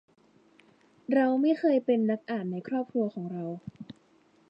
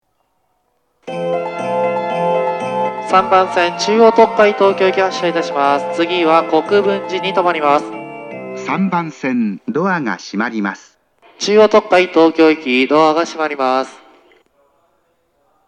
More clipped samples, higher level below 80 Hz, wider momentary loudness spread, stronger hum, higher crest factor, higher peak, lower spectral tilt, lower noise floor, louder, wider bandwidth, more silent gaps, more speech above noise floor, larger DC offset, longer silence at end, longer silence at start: neither; second, -76 dBFS vs -62 dBFS; first, 20 LU vs 11 LU; neither; about the same, 18 dB vs 14 dB; second, -12 dBFS vs 0 dBFS; first, -9 dB/octave vs -5 dB/octave; about the same, -63 dBFS vs -65 dBFS; second, -28 LUFS vs -14 LUFS; second, 5.6 kHz vs 10 kHz; neither; second, 36 dB vs 51 dB; neither; second, 0.6 s vs 1.7 s; about the same, 1.1 s vs 1.05 s